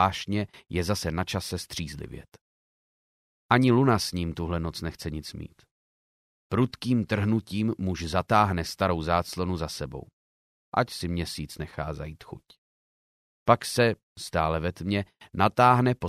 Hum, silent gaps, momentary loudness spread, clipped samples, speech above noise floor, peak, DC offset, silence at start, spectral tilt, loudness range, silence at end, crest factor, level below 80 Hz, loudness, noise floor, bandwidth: none; 2.41-3.49 s, 5.71-6.50 s, 10.13-10.72 s, 12.58-13.46 s, 14.03-14.16 s; 17 LU; under 0.1%; over 63 dB; -4 dBFS; under 0.1%; 0 s; -5.5 dB/octave; 6 LU; 0 s; 22 dB; -48 dBFS; -27 LUFS; under -90 dBFS; 15.5 kHz